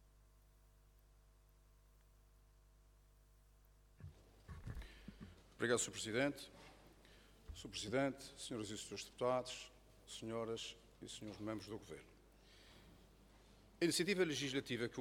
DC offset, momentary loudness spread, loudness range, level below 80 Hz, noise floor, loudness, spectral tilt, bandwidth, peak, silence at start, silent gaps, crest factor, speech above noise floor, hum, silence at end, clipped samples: under 0.1%; 22 LU; 14 LU; -66 dBFS; -69 dBFS; -43 LUFS; -3.5 dB/octave; 18 kHz; -24 dBFS; 4 s; none; 22 dB; 26 dB; 50 Hz at -70 dBFS; 0 s; under 0.1%